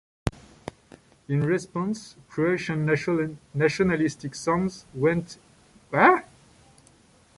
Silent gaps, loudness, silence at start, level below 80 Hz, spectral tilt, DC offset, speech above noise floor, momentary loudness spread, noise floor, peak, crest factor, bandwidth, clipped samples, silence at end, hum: none; -25 LUFS; 0.25 s; -52 dBFS; -6.5 dB/octave; under 0.1%; 33 dB; 16 LU; -57 dBFS; -4 dBFS; 22 dB; 11.5 kHz; under 0.1%; 1.15 s; none